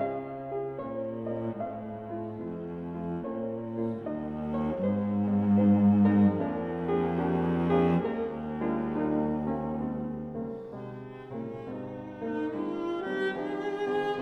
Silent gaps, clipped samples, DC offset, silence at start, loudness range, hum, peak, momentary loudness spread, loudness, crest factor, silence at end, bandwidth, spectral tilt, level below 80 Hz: none; under 0.1%; under 0.1%; 0 s; 10 LU; none; -14 dBFS; 14 LU; -30 LUFS; 16 dB; 0 s; 4.5 kHz; -9.5 dB/octave; -56 dBFS